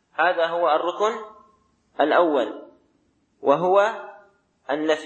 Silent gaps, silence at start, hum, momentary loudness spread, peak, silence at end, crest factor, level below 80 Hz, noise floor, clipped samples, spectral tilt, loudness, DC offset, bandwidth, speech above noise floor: none; 0.2 s; none; 23 LU; -4 dBFS; 0 s; 18 dB; -78 dBFS; -66 dBFS; under 0.1%; -4.5 dB/octave; -22 LUFS; under 0.1%; 8.6 kHz; 45 dB